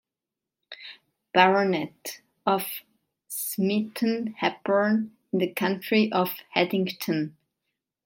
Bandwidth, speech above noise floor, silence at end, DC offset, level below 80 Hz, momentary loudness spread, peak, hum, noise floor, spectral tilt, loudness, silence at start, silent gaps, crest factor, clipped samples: 17 kHz; 63 dB; 0.75 s; under 0.1%; -74 dBFS; 17 LU; -2 dBFS; none; -88 dBFS; -5 dB/octave; -26 LUFS; 0.7 s; none; 24 dB; under 0.1%